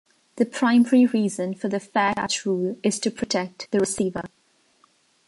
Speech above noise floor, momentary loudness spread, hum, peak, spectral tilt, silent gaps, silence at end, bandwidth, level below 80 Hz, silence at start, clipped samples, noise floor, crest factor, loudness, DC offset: 40 dB; 9 LU; none; -6 dBFS; -4.5 dB/octave; none; 1 s; 11.5 kHz; -62 dBFS; 0.35 s; under 0.1%; -62 dBFS; 16 dB; -23 LUFS; under 0.1%